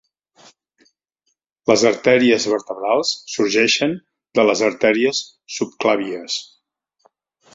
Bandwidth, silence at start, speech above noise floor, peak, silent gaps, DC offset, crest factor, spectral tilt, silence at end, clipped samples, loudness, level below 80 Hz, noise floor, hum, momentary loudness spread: 7.8 kHz; 1.65 s; 54 dB; -2 dBFS; none; under 0.1%; 18 dB; -3 dB/octave; 1.1 s; under 0.1%; -18 LUFS; -62 dBFS; -72 dBFS; none; 11 LU